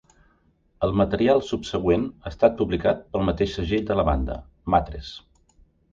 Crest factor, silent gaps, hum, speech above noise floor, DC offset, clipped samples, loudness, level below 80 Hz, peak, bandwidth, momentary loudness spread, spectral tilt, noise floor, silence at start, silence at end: 20 dB; none; none; 40 dB; under 0.1%; under 0.1%; -23 LUFS; -36 dBFS; -4 dBFS; 7.6 kHz; 13 LU; -7 dB/octave; -63 dBFS; 0.8 s; 0.75 s